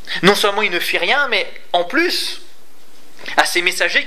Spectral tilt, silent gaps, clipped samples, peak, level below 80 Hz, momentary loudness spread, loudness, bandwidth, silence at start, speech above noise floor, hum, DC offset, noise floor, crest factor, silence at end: -2.5 dB/octave; none; under 0.1%; 0 dBFS; -56 dBFS; 7 LU; -16 LUFS; 16 kHz; 0.05 s; 32 dB; none; 5%; -49 dBFS; 18 dB; 0 s